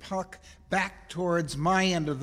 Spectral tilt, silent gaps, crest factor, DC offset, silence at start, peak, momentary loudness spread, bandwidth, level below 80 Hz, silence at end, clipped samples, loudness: -5 dB/octave; none; 16 dB; under 0.1%; 0 s; -12 dBFS; 10 LU; 14 kHz; -52 dBFS; 0 s; under 0.1%; -28 LUFS